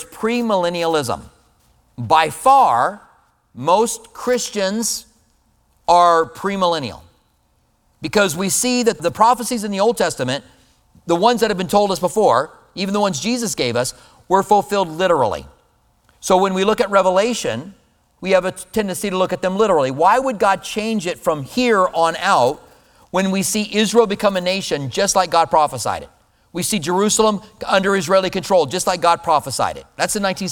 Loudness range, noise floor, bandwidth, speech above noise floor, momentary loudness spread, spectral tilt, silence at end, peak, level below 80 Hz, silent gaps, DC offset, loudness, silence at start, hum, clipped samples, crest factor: 2 LU; -61 dBFS; 19 kHz; 44 dB; 9 LU; -3.5 dB/octave; 0 s; 0 dBFS; -50 dBFS; none; under 0.1%; -17 LUFS; 0 s; none; under 0.1%; 18 dB